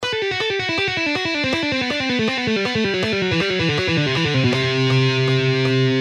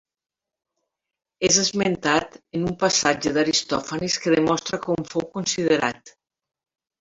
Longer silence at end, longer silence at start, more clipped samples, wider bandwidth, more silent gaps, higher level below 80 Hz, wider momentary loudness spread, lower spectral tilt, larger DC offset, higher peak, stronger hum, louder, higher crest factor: second, 0 s vs 0.9 s; second, 0 s vs 1.4 s; neither; first, 10 kHz vs 8 kHz; neither; first, -50 dBFS vs -56 dBFS; second, 3 LU vs 9 LU; first, -5.5 dB/octave vs -3 dB/octave; neither; second, -6 dBFS vs -2 dBFS; neither; first, -19 LUFS vs -22 LUFS; second, 12 dB vs 22 dB